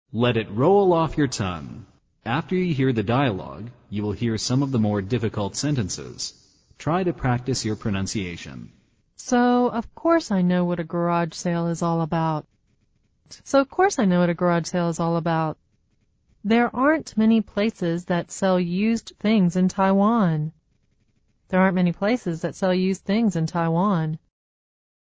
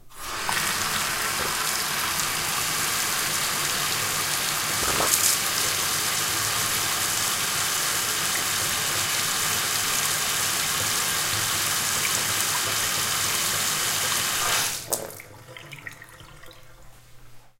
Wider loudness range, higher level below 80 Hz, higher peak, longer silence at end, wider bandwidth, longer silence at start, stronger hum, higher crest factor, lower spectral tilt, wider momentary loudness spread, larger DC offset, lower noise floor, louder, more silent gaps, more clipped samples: about the same, 4 LU vs 3 LU; about the same, -50 dBFS vs -52 dBFS; about the same, -6 dBFS vs -4 dBFS; first, 0.9 s vs 0.1 s; second, 8 kHz vs 17 kHz; about the same, 0.15 s vs 0.05 s; neither; second, 16 dB vs 22 dB; first, -6 dB/octave vs 0 dB/octave; first, 12 LU vs 3 LU; neither; first, -66 dBFS vs -46 dBFS; about the same, -23 LUFS vs -22 LUFS; neither; neither